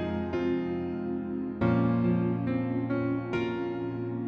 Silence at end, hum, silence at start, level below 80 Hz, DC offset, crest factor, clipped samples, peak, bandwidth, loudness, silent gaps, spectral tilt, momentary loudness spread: 0 s; none; 0 s; -54 dBFS; under 0.1%; 16 dB; under 0.1%; -14 dBFS; 6.4 kHz; -30 LUFS; none; -9.5 dB/octave; 7 LU